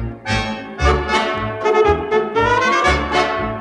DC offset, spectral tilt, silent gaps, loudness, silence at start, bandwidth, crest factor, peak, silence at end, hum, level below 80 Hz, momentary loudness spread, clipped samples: under 0.1%; -5 dB/octave; none; -17 LUFS; 0 s; 11 kHz; 16 dB; -2 dBFS; 0 s; none; -28 dBFS; 6 LU; under 0.1%